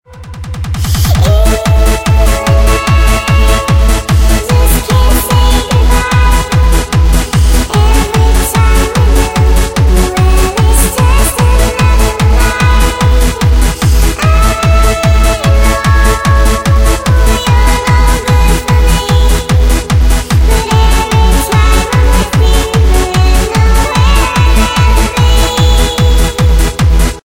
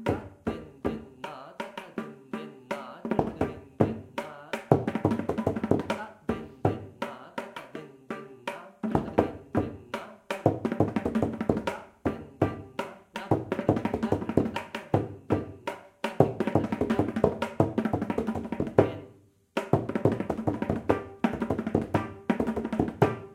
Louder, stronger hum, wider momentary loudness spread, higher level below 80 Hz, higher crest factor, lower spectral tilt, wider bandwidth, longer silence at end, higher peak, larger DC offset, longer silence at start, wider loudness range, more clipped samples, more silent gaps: first, -9 LUFS vs -30 LUFS; neither; second, 1 LU vs 13 LU; first, -10 dBFS vs -52 dBFS; second, 8 dB vs 28 dB; second, -5 dB/octave vs -8 dB/octave; about the same, 17 kHz vs 15.5 kHz; about the same, 0.05 s vs 0 s; about the same, 0 dBFS vs -2 dBFS; neither; about the same, 0.1 s vs 0 s; second, 0 LU vs 5 LU; first, 0.2% vs under 0.1%; neither